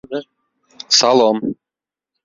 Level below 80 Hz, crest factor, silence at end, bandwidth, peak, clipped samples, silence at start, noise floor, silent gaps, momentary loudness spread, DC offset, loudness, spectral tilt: -64 dBFS; 18 dB; 0.7 s; 7.6 kHz; 0 dBFS; under 0.1%; 0.1 s; -88 dBFS; none; 17 LU; under 0.1%; -14 LUFS; -2.5 dB/octave